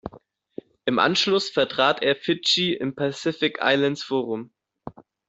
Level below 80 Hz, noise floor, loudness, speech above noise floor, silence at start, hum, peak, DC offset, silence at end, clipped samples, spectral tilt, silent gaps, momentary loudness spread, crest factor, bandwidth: -62 dBFS; -52 dBFS; -22 LUFS; 29 dB; 0.05 s; none; -4 dBFS; under 0.1%; 0.35 s; under 0.1%; -4 dB/octave; none; 23 LU; 20 dB; 8.2 kHz